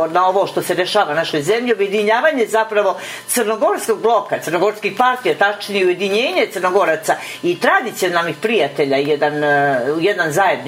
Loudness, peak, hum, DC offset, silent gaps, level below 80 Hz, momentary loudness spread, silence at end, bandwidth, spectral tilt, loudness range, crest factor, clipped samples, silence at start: -16 LUFS; 0 dBFS; none; under 0.1%; none; -68 dBFS; 4 LU; 0 s; 16 kHz; -3.5 dB/octave; 1 LU; 16 dB; under 0.1%; 0 s